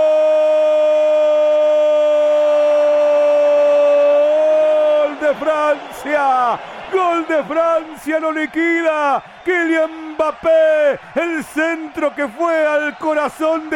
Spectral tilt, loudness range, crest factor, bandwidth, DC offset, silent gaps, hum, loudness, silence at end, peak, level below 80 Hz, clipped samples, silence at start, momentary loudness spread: -4 dB/octave; 4 LU; 10 dB; 11.5 kHz; under 0.1%; none; none; -15 LUFS; 0 s; -6 dBFS; -60 dBFS; under 0.1%; 0 s; 7 LU